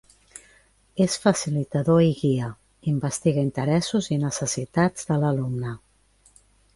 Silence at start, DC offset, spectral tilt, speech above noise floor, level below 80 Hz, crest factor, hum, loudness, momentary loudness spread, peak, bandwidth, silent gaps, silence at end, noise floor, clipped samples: 0.35 s; under 0.1%; -6 dB/octave; 37 dB; -54 dBFS; 18 dB; none; -24 LUFS; 11 LU; -6 dBFS; 11.5 kHz; none; 1 s; -60 dBFS; under 0.1%